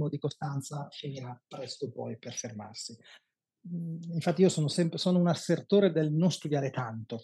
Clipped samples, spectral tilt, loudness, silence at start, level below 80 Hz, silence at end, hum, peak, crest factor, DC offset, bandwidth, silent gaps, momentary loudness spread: under 0.1%; -6 dB/octave; -30 LUFS; 0 s; -88 dBFS; 0 s; none; -12 dBFS; 18 dB; under 0.1%; 12.5 kHz; none; 15 LU